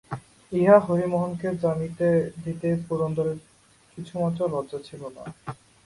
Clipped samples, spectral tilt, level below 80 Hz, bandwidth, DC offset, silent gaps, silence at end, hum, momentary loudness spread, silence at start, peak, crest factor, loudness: under 0.1%; -8.5 dB/octave; -58 dBFS; 11.5 kHz; under 0.1%; none; 0.3 s; none; 21 LU; 0.1 s; -4 dBFS; 22 dB; -24 LUFS